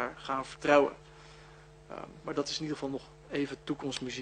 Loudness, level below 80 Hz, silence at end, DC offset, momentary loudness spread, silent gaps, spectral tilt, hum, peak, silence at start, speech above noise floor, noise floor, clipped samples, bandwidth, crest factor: -33 LUFS; -62 dBFS; 0 s; under 0.1%; 26 LU; none; -4.5 dB/octave; none; -10 dBFS; 0 s; 21 dB; -54 dBFS; under 0.1%; 10 kHz; 24 dB